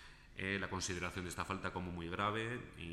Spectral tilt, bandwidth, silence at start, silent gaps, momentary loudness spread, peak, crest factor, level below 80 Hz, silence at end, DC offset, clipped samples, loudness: -4 dB/octave; 15 kHz; 0 s; none; 6 LU; -22 dBFS; 20 dB; -60 dBFS; 0 s; under 0.1%; under 0.1%; -41 LUFS